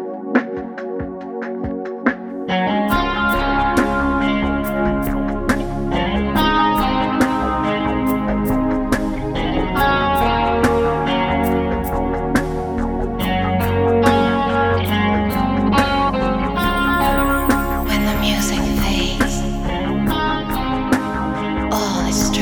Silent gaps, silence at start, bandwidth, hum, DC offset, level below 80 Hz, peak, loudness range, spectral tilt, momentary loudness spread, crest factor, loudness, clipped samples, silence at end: none; 0 s; over 20 kHz; none; under 0.1%; -28 dBFS; 0 dBFS; 3 LU; -5.5 dB/octave; 6 LU; 18 dB; -18 LUFS; under 0.1%; 0 s